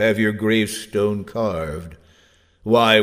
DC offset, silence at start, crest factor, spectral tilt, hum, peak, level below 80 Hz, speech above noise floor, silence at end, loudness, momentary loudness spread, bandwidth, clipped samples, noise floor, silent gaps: under 0.1%; 0 s; 18 dB; -5 dB/octave; none; -2 dBFS; -48 dBFS; 37 dB; 0 s; -20 LUFS; 16 LU; 16 kHz; under 0.1%; -56 dBFS; none